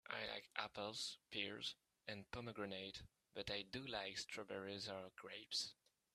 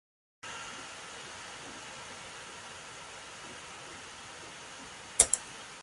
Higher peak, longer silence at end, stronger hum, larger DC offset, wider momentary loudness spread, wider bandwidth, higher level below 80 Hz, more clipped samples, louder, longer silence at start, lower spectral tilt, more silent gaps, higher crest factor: second, -24 dBFS vs -2 dBFS; first, 0.4 s vs 0 s; neither; neither; second, 9 LU vs 19 LU; first, 13.5 kHz vs 11.5 kHz; second, -76 dBFS vs -62 dBFS; neither; second, -49 LUFS vs -36 LUFS; second, 0.05 s vs 0.45 s; first, -2.5 dB/octave vs 0 dB/octave; neither; second, 26 dB vs 38 dB